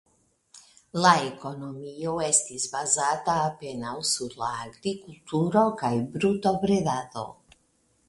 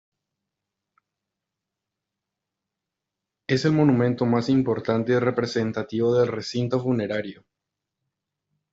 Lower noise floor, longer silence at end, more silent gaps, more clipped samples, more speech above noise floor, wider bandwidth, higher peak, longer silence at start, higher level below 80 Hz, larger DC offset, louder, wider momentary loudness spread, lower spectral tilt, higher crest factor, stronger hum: second, -68 dBFS vs -86 dBFS; second, 0.75 s vs 1.4 s; neither; neither; second, 41 dB vs 63 dB; first, 11.5 kHz vs 7.8 kHz; about the same, -4 dBFS vs -6 dBFS; second, 0.55 s vs 3.5 s; about the same, -62 dBFS vs -64 dBFS; neither; second, -26 LUFS vs -23 LUFS; first, 14 LU vs 8 LU; second, -3.5 dB/octave vs -7 dB/octave; about the same, 24 dB vs 20 dB; neither